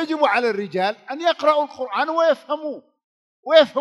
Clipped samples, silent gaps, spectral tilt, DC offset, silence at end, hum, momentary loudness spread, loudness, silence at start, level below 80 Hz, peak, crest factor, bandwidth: under 0.1%; 3.04-3.43 s; -4.5 dB/octave; under 0.1%; 0 s; none; 11 LU; -20 LUFS; 0 s; -78 dBFS; -2 dBFS; 18 dB; 11.5 kHz